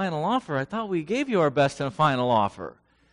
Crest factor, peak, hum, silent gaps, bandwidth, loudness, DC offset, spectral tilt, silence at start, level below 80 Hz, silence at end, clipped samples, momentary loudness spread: 16 dB; -8 dBFS; none; none; 10.5 kHz; -25 LUFS; under 0.1%; -6 dB/octave; 0 s; -60 dBFS; 0.4 s; under 0.1%; 7 LU